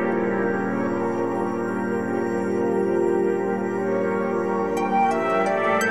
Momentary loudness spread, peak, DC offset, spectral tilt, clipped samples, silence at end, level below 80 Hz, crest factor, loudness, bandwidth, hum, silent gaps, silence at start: 4 LU; -8 dBFS; 0.4%; -6.5 dB/octave; under 0.1%; 0 s; -62 dBFS; 14 dB; -23 LUFS; 13.5 kHz; none; none; 0 s